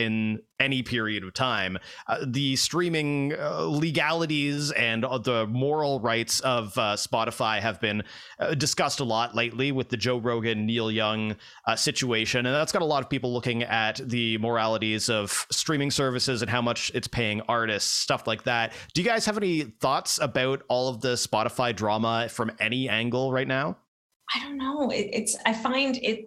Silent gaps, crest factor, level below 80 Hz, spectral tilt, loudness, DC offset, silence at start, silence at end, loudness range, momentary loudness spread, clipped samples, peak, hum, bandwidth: 23.88-24.10 s, 24.16-24.20 s; 22 dB; -60 dBFS; -3.5 dB/octave; -26 LUFS; under 0.1%; 0 s; 0 s; 1 LU; 4 LU; under 0.1%; -4 dBFS; none; 15.5 kHz